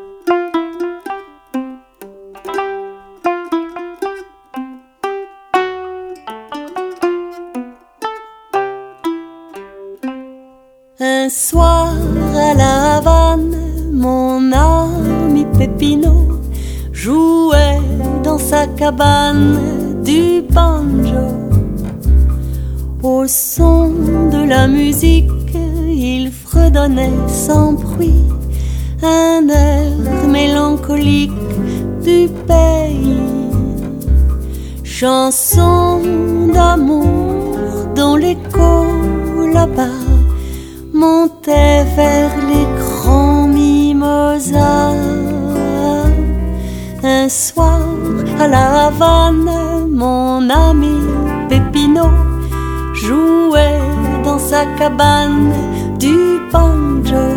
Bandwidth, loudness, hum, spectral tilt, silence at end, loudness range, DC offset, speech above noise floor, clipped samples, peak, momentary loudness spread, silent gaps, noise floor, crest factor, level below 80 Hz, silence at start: 18 kHz; -13 LUFS; none; -6 dB/octave; 0 s; 11 LU; under 0.1%; 36 dB; under 0.1%; 0 dBFS; 14 LU; none; -46 dBFS; 12 dB; -18 dBFS; 0 s